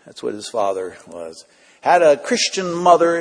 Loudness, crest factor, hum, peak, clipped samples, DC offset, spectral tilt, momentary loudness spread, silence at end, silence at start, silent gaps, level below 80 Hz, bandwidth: -17 LUFS; 18 dB; none; 0 dBFS; under 0.1%; under 0.1%; -3 dB/octave; 20 LU; 0 s; 0.05 s; none; -66 dBFS; 10.5 kHz